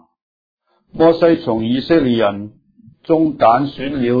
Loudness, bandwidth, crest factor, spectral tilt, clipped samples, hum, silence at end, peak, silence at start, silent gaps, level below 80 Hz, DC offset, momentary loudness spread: -15 LUFS; 5 kHz; 16 dB; -9 dB/octave; under 0.1%; none; 0 s; 0 dBFS; 0.95 s; none; -48 dBFS; under 0.1%; 10 LU